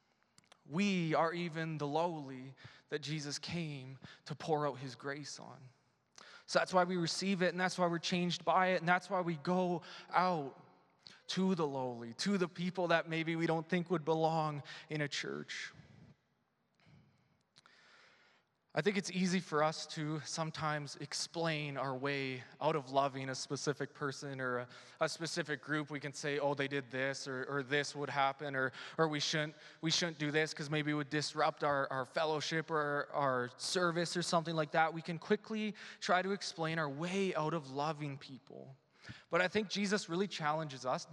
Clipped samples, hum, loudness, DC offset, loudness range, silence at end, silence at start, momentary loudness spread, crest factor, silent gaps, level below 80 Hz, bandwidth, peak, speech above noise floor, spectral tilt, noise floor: under 0.1%; none; -37 LUFS; under 0.1%; 6 LU; 0 s; 0.7 s; 10 LU; 24 dB; none; -84 dBFS; 12 kHz; -14 dBFS; 43 dB; -4.5 dB/octave; -79 dBFS